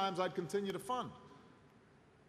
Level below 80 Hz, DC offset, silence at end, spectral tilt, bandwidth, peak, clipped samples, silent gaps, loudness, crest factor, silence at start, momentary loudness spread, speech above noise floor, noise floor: -76 dBFS; under 0.1%; 0.6 s; -5 dB/octave; 13.5 kHz; -22 dBFS; under 0.1%; none; -40 LUFS; 20 dB; 0 s; 22 LU; 26 dB; -65 dBFS